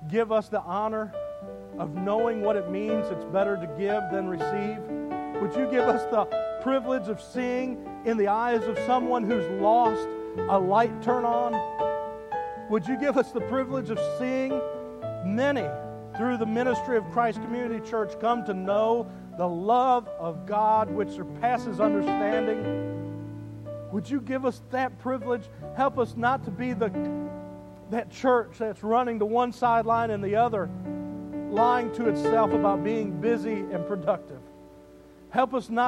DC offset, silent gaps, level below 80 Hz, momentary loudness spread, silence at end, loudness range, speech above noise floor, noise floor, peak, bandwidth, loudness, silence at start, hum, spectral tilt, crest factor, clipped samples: under 0.1%; none; -58 dBFS; 11 LU; 0 s; 4 LU; 24 dB; -50 dBFS; -10 dBFS; 12 kHz; -27 LUFS; 0 s; none; -7 dB/octave; 18 dB; under 0.1%